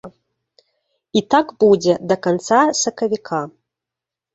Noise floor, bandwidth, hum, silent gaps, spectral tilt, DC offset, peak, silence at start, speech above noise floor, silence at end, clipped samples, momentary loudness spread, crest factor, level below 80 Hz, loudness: -86 dBFS; 8 kHz; none; none; -4 dB/octave; under 0.1%; -2 dBFS; 0.05 s; 69 dB; 0.85 s; under 0.1%; 9 LU; 18 dB; -60 dBFS; -17 LUFS